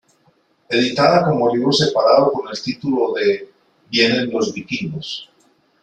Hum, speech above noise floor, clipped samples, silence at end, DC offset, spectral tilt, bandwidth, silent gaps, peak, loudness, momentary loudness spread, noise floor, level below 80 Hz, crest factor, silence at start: none; 42 dB; under 0.1%; 0.6 s; under 0.1%; -5 dB/octave; 9.4 kHz; none; -2 dBFS; -17 LUFS; 12 LU; -59 dBFS; -58 dBFS; 18 dB; 0.7 s